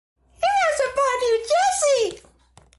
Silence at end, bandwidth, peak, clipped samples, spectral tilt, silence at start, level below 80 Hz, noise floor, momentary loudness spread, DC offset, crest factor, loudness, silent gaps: 0.6 s; 11.5 kHz; -8 dBFS; under 0.1%; -0.5 dB/octave; 0.4 s; -56 dBFS; -54 dBFS; 4 LU; under 0.1%; 14 dB; -21 LUFS; none